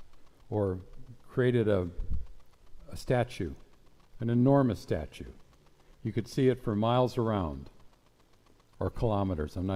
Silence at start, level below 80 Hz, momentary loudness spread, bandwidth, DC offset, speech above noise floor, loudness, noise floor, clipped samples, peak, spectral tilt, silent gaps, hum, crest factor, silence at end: 0 s; -46 dBFS; 15 LU; 14.5 kHz; under 0.1%; 33 dB; -31 LUFS; -62 dBFS; under 0.1%; -12 dBFS; -8 dB/octave; none; none; 18 dB; 0 s